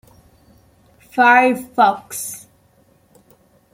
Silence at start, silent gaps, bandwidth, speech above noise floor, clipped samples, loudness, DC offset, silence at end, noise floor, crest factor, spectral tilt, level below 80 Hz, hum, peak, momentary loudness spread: 1.15 s; none; 16.5 kHz; 40 dB; under 0.1%; -16 LUFS; under 0.1%; 1.35 s; -55 dBFS; 18 dB; -3 dB/octave; -62 dBFS; none; -2 dBFS; 17 LU